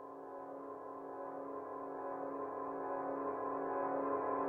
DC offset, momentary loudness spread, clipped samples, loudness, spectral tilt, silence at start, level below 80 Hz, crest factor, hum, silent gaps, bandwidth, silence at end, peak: under 0.1%; 10 LU; under 0.1%; -42 LUFS; -9 dB/octave; 0 s; -80 dBFS; 16 dB; none; none; 3.6 kHz; 0 s; -26 dBFS